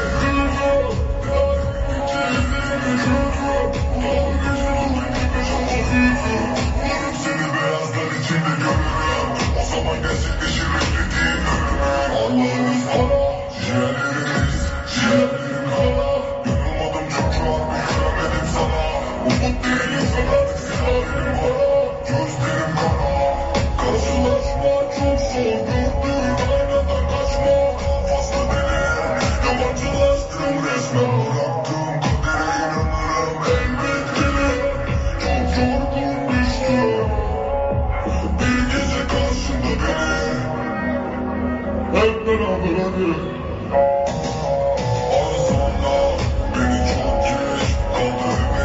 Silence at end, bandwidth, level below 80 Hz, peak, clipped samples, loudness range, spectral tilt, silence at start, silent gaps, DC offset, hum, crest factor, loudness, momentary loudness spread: 0 s; 8 kHz; -26 dBFS; -4 dBFS; under 0.1%; 1 LU; -5 dB/octave; 0 s; none; under 0.1%; none; 14 dB; -20 LUFS; 4 LU